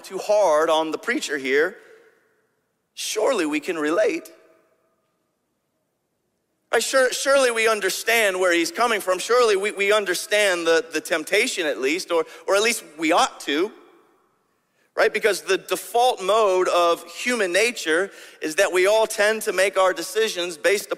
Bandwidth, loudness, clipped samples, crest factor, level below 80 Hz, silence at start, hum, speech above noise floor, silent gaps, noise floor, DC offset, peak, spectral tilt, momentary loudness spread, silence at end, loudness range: 16 kHz; -21 LUFS; under 0.1%; 18 dB; -70 dBFS; 0.05 s; none; 52 dB; none; -73 dBFS; under 0.1%; -4 dBFS; -1.5 dB/octave; 6 LU; 0 s; 7 LU